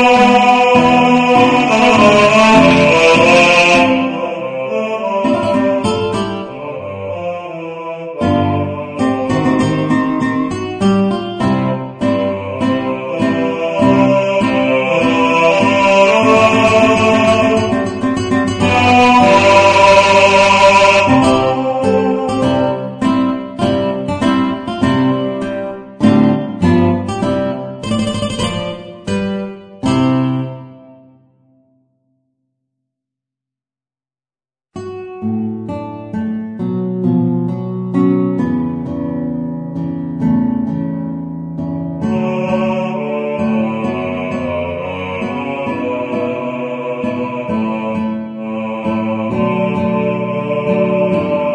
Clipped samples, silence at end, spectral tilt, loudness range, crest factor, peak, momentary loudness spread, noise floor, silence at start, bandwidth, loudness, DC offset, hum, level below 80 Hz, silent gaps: under 0.1%; 0 s; -5.5 dB/octave; 11 LU; 14 dB; 0 dBFS; 14 LU; under -90 dBFS; 0 s; 10 kHz; -13 LUFS; under 0.1%; none; -44 dBFS; none